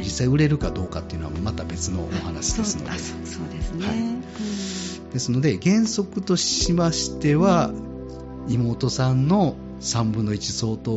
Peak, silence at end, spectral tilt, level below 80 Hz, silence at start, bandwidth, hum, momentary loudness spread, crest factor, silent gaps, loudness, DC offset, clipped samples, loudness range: -8 dBFS; 0 s; -6 dB/octave; -38 dBFS; 0 s; 8 kHz; none; 11 LU; 16 dB; none; -23 LUFS; under 0.1%; under 0.1%; 6 LU